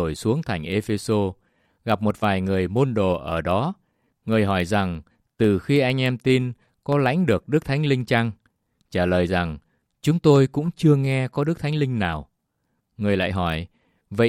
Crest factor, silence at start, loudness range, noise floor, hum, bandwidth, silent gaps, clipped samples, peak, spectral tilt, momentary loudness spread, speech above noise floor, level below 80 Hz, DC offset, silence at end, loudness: 18 dB; 0 s; 2 LU; -74 dBFS; none; 15 kHz; none; under 0.1%; -4 dBFS; -7 dB/octave; 10 LU; 52 dB; -50 dBFS; under 0.1%; 0 s; -22 LUFS